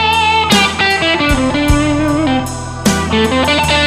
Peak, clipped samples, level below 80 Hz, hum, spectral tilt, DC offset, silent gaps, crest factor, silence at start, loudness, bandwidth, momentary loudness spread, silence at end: 0 dBFS; under 0.1%; -24 dBFS; none; -4 dB/octave; under 0.1%; none; 12 dB; 0 s; -12 LUFS; 16 kHz; 6 LU; 0 s